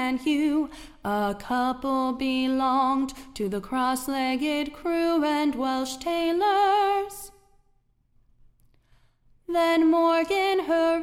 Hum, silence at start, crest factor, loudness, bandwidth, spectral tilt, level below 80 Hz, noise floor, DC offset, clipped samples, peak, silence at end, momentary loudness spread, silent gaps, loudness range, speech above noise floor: none; 0 s; 12 dB; -25 LUFS; 16.5 kHz; -4 dB/octave; -54 dBFS; -65 dBFS; under 0.1%; under 0.1%; -12 dBFS; 0 s; 9 LU; none; 3 LU; 41 dB